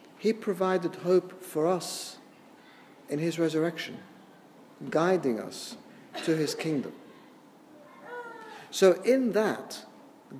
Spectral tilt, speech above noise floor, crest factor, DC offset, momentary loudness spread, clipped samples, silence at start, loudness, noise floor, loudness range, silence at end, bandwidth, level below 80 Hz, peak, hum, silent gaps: -5 dB/octave; 26 dB; 22 dB; under 0.1%; 19 LU; under 0.1%; 0.2 s; -28 LUFS; -54 dBFS; 5 LU; 0 s; 15.5 kHz; -86 dBFS; -8 dBFS; none; none